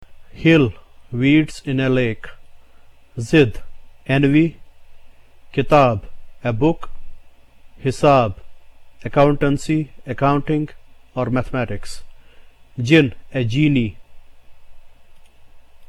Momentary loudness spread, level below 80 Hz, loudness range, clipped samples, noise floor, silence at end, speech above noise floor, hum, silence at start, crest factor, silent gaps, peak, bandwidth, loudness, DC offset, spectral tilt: 17 LU; -38 dBFS; 3 LU; under 0.1%; -44 dBFS; 0.05 s; 27 dB; none; 0 s; 18 dB; none; -2 dBFS; 12 kHz; -18 LUFS; under 0.1%; -7 dB/octave